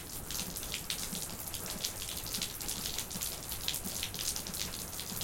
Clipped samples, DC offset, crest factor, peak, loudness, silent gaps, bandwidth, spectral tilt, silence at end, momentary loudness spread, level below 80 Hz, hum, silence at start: under 0.1%; under 0.1%; 26 dB; -14 dBFS; -36 LUFS; none; 17 kHz; -1.5 dB/octave; 0 s; 3 LU; -52 dBFS; none; 0 s